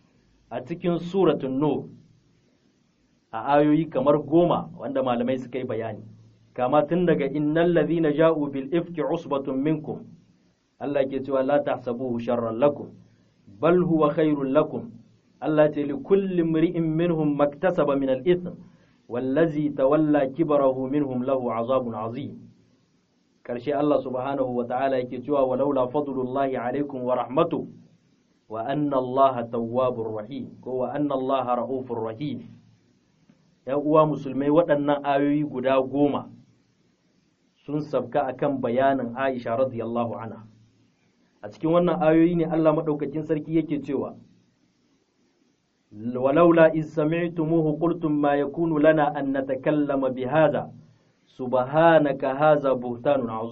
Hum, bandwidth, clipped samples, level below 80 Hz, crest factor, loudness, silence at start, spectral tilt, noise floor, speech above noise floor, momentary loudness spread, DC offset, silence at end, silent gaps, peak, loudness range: none; 6.2 kHz; under 0.1%; -58 dBFS; 22 dB; -24 LUFS; 0.5 s; -6.5 dB/octave; -67 dBFS; 44 dB; 12 LU; under 0.1%; 0 s; none; -2 dBFS; 5 LU